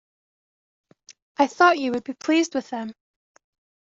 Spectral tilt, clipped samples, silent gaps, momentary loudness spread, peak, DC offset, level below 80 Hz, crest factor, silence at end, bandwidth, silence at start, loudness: -3 dB/octave; under 0.1%; none; 16 LU; -4 dBFS; under 0.1%; -70 dBFS; 20 dB; 1.05 s; 7.8 kHz; 1.4 s; -22 LUFS